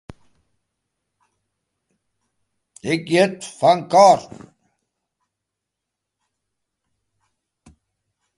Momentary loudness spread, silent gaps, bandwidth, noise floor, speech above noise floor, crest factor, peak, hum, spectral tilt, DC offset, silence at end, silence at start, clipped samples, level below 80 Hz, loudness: 12 LU; none; 11.5 kHz; -82 dBFS; 66 dB; 22 dB; 0 dBFS; none; -4.5 dB/octave; under 0.1%; 4.15 s; 2.85 s; under 0.1%; -64 dBFS; -17 LUFS